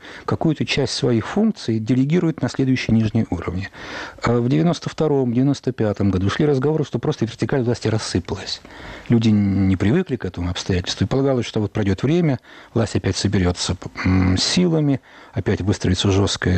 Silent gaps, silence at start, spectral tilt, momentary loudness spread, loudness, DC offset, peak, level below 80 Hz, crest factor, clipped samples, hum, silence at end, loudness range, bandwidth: none; 0.05 s; -6 dB/octave; 8 LU; -20 LUFS; under 0.1%; -8 dBFS; -44 dBFS; 12 dB; under 0.1%; none; 0 s; 1 LU; 8.8 kHz